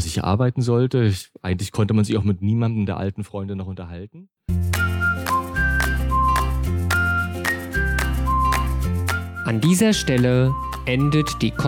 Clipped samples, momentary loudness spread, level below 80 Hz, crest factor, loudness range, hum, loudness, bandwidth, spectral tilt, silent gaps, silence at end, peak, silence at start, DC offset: under 0.1%; 10 LU; -30 dBFS; 14 dB; 4 LU; none; -21 LUFS; 19.5 kHz; -5.5 dB/octave; none; 0 s; -8 dBFS; 0 s; under 0.1%